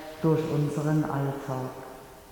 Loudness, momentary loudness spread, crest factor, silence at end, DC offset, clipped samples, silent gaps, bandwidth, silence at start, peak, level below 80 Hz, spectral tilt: -28 LUFS; 17 LU; 16 dB; 0 s; under 0.1%; under 0.1%; none; 19 kHz; 0 s; -12 dBFS; -56 dBFS; -8 dB/octave